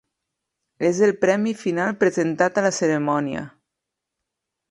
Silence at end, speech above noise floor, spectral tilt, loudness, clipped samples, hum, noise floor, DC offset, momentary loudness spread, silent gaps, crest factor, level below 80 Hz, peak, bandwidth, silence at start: 1.25 s; 63 dB; -5.5 dB/octave; -21 LUFS; under 0.1%; none; -83 dBFS; under 0.1%; 6 LU; none; 18 dB; -64 dBFS; -4 dBFS; 11.5 kHz; 0.8 s